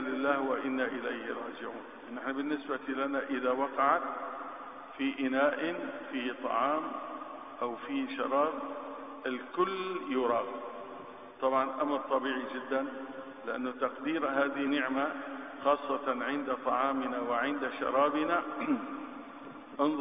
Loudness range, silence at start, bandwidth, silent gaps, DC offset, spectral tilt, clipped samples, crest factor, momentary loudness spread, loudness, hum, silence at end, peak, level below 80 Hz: 3 LU; 0 s; 5 kHz; none; under 0.1%; -8 dB/octave; under 0.1%; 20 dB; 13 LU; -33 LUFS; none; 0 s; -14 dBFS; -74 dBFS